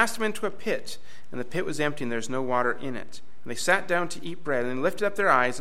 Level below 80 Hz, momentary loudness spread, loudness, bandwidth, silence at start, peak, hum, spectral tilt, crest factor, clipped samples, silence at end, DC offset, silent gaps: -64 dBFS; 16 LU; -27 LUFS; 16 kHz; 0 s; -6 dBFS; none; -4 dB/octave; 22 dB; under 0.1%; 0 s; 3%; none